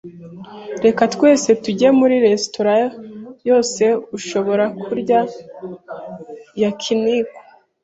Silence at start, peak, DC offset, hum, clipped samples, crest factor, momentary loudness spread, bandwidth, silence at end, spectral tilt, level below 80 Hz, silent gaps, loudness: 0.05 s; -2 dBFS; under 0.1%; none; under 0.1%; 16 dB; 20 LU; 8.2 kHz; 0.45 s; -4.5 dB/octave; -62 dBFS; none; -17 LUFS